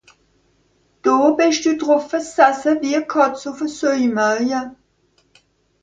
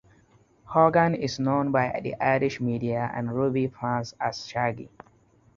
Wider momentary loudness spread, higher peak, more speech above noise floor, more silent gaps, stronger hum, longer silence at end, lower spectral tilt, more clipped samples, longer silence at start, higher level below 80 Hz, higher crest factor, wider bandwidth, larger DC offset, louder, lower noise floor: about the same, 9 LU vs 9 LU; first, 0 dBFS vs -6 dBFS; first, 44 dB vs 35 dB; neither; neither; first, 1.1 s vs 0.7 s; second, -3.5 dB/octave vs -6.5 dB/octave; neither; first, 1.05 s vs 0.65 s; about the same, -62 dBFS vs -58 dBFS; about the same, 18 dB vs 20 dB; first, 9.2 kHz vs 7.4 kHz; neither; first, -18 LUFS vs -26 LUFS; about the same, -61 dBFS vs -60 dBFS